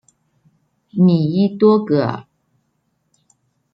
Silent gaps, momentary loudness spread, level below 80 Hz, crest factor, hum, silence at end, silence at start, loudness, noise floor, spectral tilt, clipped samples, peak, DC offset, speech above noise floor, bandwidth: none; 13 LU; -64 dBFS; 16 dB; none; 1.5 s; 0.95 s; -16 LUFS; -68 dBFS; -10 dB/octave; under 0.1%; -2 dBFS; under 0.1%; 53 dB; 5.6 kHz